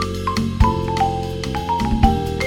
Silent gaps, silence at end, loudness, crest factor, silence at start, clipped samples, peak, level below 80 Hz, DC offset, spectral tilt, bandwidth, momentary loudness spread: none; 0 s; -20 LUFS; 18 dB; 0 s; under 0.1%; 0 dBFS; -26 dBFS; under 0.1%; -6.5 dB/octave; 16.5 kHz; 7 LU